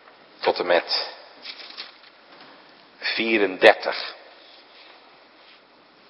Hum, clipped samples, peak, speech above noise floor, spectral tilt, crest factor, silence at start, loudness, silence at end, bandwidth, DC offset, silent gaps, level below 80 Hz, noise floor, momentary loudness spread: none; under 0.1%; 0 dBFS; 33 dB; -4 dB/octave; 26 dB; 0.4 s; -21 LUFS; 1.9 s; 11 kHz; under 0.1%; none; -72 dBFS; -54 dBFS; 22 LU